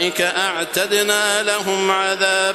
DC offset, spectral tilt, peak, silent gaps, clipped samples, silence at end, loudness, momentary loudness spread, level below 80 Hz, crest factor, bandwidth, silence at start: under 0.1%; -1 dB/octave; -2 dBFS; none; under 0.1%; 0 s; -17 LUFS; 3 LU; -64 dBFS; 16 dB; 14 kHz; 0 s